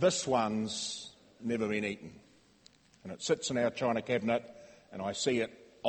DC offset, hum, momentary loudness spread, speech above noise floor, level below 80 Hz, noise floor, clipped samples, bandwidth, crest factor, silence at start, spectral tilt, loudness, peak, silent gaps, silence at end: under 0.1%; none; 18 LU; 31 dB; -70 dBFS; -63 dBFS; under 0.1%; 8.8 kHz; 20 dB; 0 s; -4 dB/octave; -33 LUFS; -14 dBFS; none; 0 s